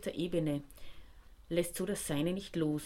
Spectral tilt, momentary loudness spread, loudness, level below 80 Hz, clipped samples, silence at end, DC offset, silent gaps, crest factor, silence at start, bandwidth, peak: -5.5 dB/octave; 7 LU; -36 LUFS; -56 dBFS; under 0.1%; 0 s; under 0.1%; none; 16 dB; 0 s; 16.5 kHz; -20 dBFS